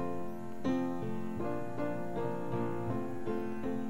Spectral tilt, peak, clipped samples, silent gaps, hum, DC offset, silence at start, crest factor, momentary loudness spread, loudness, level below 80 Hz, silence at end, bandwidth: -8 dB/octave; -22 dBFS; under 0.1%; none; none; 1%; 0 s; 16 dB; 4 LU; -37 LUFS; -58 dBFS; 0 s; 16 kHz